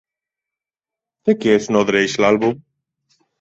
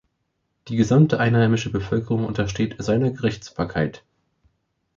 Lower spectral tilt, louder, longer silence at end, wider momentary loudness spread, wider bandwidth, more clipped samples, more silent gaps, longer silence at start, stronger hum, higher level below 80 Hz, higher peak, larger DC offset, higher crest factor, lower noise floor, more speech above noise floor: second, -5 dB/octave vs -7 dB/octave; first, -17 LUFS vs -22 LUFS; second, 0.85 s vs 1 s; second, 7 LU vs 10 LU; about the same, 8 kHz vs 7.6 kHz; neither; neither; first, 1.25 s vs 0.65 s; neither; second, -56 dBFS vs -46 dBFS; about the same, -2 dBFS vs -4 dBFS; neither; about the same, 18 dB vs 18 dB; first, -88 dBFS vs -74 dBFS; first, 73 dB vs 53 dB